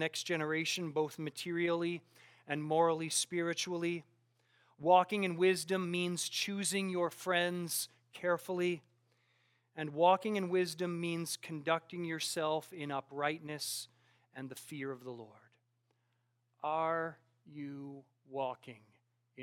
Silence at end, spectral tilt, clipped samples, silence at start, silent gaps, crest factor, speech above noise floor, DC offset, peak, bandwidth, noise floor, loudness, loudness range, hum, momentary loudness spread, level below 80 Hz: 0 s; -4 dB/octave; under 0.1%; 0 s; none; 22 dB; 44 dB; under 0.1%; -14 dBFS; 17.5 kHz; -79 dBFS; -35 LUFS; 9 LU; none; 16 LU; under -90 dBFS